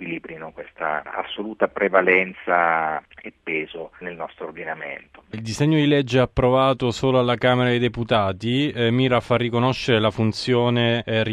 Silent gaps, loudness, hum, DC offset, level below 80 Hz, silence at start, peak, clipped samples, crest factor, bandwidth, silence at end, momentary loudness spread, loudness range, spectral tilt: none; -21 LUFS; none; under 0.1%; -48 dBFS; 0 s; -2 dBFS; under 0.1%; 20 dB; 11 kHz; 0 s; 15 LU; 6 LU; -6.5 dB/octave